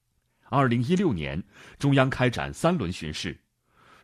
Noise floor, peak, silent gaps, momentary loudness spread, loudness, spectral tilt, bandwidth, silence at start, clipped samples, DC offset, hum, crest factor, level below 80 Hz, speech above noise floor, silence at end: -63 dBFS; -6 dBFS; none; 11 LU; -26 LUFS; -6.5 dB/octave; 13 kHz; 0.5 s; under 0.1%; under 0.1%; none; 20 dB; -50 dBFS; 38 dB; 0.7 s